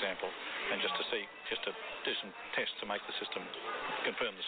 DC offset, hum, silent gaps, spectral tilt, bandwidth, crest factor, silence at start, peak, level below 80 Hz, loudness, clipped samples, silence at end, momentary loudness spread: under 0.1%; none; none; 1 dB/octave; 4.6 kHz; 20 dB; 0 s; -18 dBFS; -76 dBFS; -37 LUFS; under 0.1%; 0 s; 6 LU